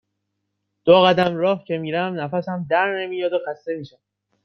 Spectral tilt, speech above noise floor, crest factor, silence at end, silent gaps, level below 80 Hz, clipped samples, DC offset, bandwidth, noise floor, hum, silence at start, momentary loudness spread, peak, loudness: -7 dB/octave; 56 dB; 20 dB; 0.6 s; none; -62 dBFS; under 0.1%; under 0.1%; 6.4 kHz; -76 dBFS; none; 0.85 s; 14 LU; -2 dBFS; -20 LUFS